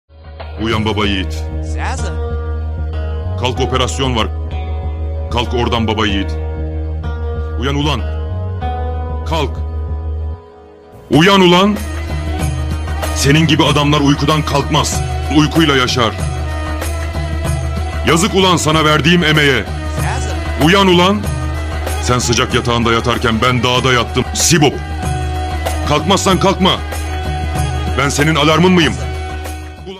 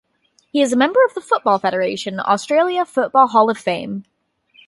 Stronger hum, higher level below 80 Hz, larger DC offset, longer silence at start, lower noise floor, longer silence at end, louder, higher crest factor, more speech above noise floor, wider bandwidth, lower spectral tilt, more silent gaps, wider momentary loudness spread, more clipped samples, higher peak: neither; first, -24 dBFS vs -68 dBFS; neither; second, 0.15 s vs 0.55 s; second, -38 dBFS vs -61 dBFS; second, 0 s vs 0.65 s; first, -14 LUFS vs -17 LUFS; about the same, 14 dB vs 18 dB; second, 26 dB vs 45 dB; first, 15.5 kHz vs 11.5 kHz; about the same, -4.5 dB/octave vs -4.5 dB/octave; neither; first, 12 LU vs 9 LU; neither; about the same, 0 dBFS vs 0 dBFS